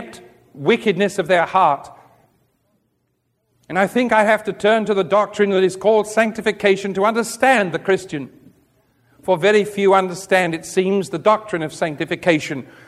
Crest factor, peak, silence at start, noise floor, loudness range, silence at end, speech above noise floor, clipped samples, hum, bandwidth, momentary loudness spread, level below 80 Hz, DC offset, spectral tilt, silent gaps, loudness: 18 dB; 0 dBFS; 0 s; -69 dBFS; 4 LU; 0.25 s; 51 dB; under 0.1%; none; 14 kHz; 8 LU; -62 dBFS; under 0.1%; -5 dB/octave; none; -18 LUFS